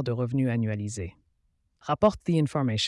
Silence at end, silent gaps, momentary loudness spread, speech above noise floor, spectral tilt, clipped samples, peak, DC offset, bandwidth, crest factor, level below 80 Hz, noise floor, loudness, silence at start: 0 s; none; 13 LU; 45 dB; -6 dB/octave; under 0.1%; -8 dBFS; under 0.1%; 11.5 kHz; 18 dB; -54 dBFS; -71 dBFS; -27 LUFS; 0 s